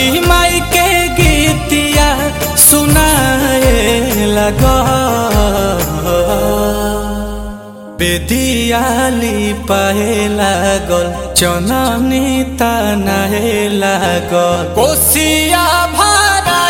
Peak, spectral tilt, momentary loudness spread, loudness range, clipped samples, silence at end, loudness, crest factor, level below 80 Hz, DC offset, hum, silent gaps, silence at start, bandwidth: 0 dBFS; -3.5 dB/octave; 6 LU; 5 LU; 0.1%; 0 s; -11 LUFS; 12 dB; -22 dBFS; under 0.1%; none; none; 0 s; over 20 kHz